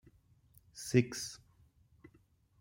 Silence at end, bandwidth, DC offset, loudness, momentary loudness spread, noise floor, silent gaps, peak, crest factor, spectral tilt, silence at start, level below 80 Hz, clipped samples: 0.55 s; 16.5 kHz; under 0.1%; -35 LUFS; 23 LU; -69 dBFS; none; -14 dBFS; 26 dB; -5.5 dB/octave; 0.75 s; -68 dBFS; under 0.1%